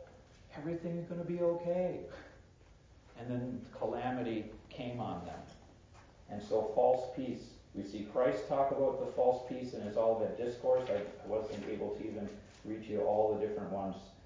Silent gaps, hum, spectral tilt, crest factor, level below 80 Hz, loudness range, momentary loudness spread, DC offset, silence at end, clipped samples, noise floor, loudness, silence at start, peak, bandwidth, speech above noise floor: none; none; -7.5 dB/octave; 20 dB; -62 dBFS; 7 LU; 15 LU; under 0.1%; 0 s; under 0.1%; -61 dBFS; -36 LUFS; 0 s; -16 dBFS; 7.6 kHz; 25 dB